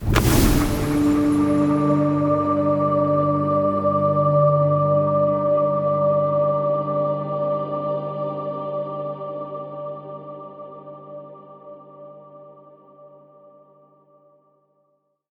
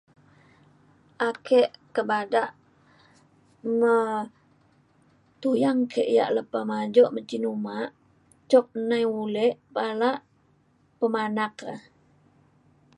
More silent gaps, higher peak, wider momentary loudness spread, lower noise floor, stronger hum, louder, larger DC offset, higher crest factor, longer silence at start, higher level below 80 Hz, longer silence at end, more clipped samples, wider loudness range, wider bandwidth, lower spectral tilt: neither; first, -2 dBFS vs -6 dBFS; first, 20 LU vs 12 LU; first, -68 dBFS vs -64 dBFS; neither; first, -20 LUFS vs -25 LUFS; neither; about the same, 18 dB vs 20 dB; second, 0 s vs 1.2 s; first, -36 dBFS vs -76 dBFS; first, 2.25 s vs 1.2 s; neither; first, 18 LU vs 4 LU; first, over 20 kHz vs 11 kHz; about the same, -7 dB/octave vs -6 dB/octave